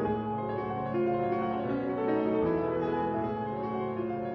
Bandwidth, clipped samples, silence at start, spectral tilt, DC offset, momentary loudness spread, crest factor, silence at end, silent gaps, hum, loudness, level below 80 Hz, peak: 5.8 kHz; under 0.1%; 0 s; -10 dB/octave; under 0.1%; 5 LU; 14 dB; 0 s; none; none; -31 LUFS; -58 dBFS; -16 dBFS